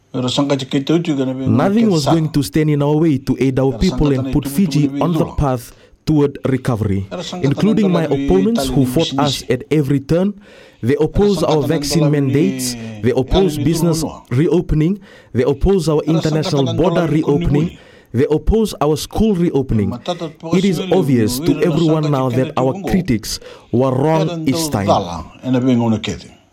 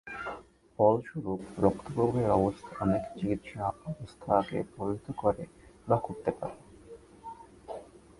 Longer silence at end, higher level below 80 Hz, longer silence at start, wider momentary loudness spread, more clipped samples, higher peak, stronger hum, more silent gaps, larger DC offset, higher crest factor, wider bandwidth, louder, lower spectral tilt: about the same, 0.25 s vs 0.35 s; first, -32 dBFS vs -56 dBFS; about the same, 0.15 s vs 0.05 s; second, 6 LU vs 21 LU; neither; first, 0 dBFS vs -8 dBFS; neither; neither; neither; second, 16 dB vs 22 dB; first, 16.5 kHz vs 11.5 kHz; first, -16 LUFS vs -31 LUFS; second, -6.5 dB/octave vs -8.5 dB/octave